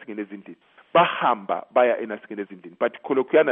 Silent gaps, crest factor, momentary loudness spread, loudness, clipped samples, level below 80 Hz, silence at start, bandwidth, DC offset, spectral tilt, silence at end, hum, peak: none; 18 dB; 15 LU; -22 LUFS; under 0.1%; -82 dBFS; 0 s; 3.8 kHz; under 0.1%; -2.5 dB/octave; 0 s; none; -4 dBFS